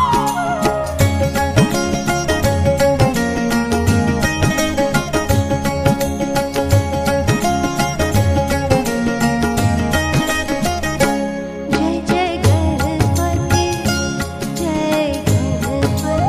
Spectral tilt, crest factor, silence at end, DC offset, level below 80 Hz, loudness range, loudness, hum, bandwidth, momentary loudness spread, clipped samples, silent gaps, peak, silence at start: -5.5 dB/octave; 16 dB; 0 s; under 0.1%; -30 dBFS; 1 LU; -17 LUFS; none; 15.5 kHz; 4 LU; under 0.1%; none; 0 dBFS; 0 s